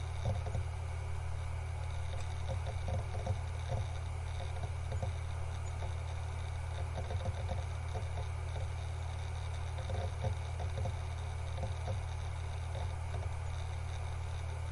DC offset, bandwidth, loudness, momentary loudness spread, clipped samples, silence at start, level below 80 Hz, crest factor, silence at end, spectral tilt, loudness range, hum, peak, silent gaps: under 0.1%; 11.5 kHz; -40 LUFS; 2 LU; under 0.1%; 0 s; -46 dBFS; 14 dB; 0 s; -6 dB/octave; 1 LU; none; -24 dBFS; none